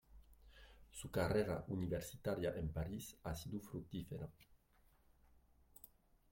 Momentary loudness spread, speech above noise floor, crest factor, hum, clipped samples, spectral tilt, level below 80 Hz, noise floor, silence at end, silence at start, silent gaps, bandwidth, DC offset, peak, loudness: 22 LU; 30 dB; 20 dB; none; under 0.1%; -6 dB/octave; -60 dBFS; -73 dBFS; 0.45 s; 0.1 s; none; 16.5 kHz; under 0.1%; -26 dBFS; -44 LUFS